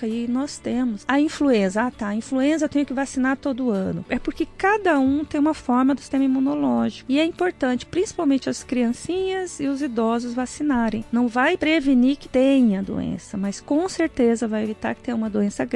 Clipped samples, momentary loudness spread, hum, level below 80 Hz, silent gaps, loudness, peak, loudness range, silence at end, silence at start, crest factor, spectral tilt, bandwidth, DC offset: under 0.1%; 7 LU; none; -50 dBFS; none; -22 LUFS; -6 dBFS; 3 LU; 0 s; 0 s; 14 dB; -5.5 dB/octave; 11 kHz; under 0.1%